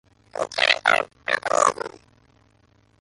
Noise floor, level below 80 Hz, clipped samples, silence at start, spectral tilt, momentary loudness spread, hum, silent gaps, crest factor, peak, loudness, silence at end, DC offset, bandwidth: -60 dBFS; -64 dBFS; under 0.1%; 0.35 s; -0.5 dB/octave; 17 LU; none; none; 24 dB; 0 dBFS; -21 LUFS; 1.15 s; under 0.1%; 11.5 kHz